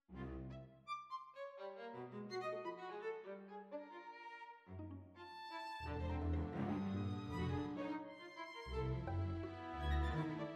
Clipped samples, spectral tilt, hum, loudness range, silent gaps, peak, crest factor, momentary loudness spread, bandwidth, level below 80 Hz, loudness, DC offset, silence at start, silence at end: under 0.1%; -7.5 dB/octave; none; 6 LU; none; -28 dBFS; 16 dB; 12 LU; 9.4 kHz; -52 dBFS; -46 LUFS; under 0.1%; 0.1 s; 0 s